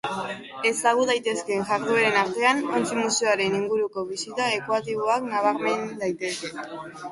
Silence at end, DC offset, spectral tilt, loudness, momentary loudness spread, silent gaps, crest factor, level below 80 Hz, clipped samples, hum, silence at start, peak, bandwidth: 0 s; under 0.1%; -3 dB/octave; -24 LUFS; 10 LU; none; 18 dB; -68 dBFS; under 0.1%; none; 0.05 s; -6 dBFS; 11.5 kHz